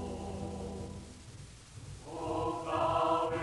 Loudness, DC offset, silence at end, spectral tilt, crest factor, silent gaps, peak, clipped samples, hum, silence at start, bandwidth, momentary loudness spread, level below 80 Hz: -35 LUFS; under 0.1%; 0 s; -6 dB/octave; 18 dB; none; -18 dBFS; under 0.1%; none; 0 s; 11.5 kHz; 20 LU; -54 dBFS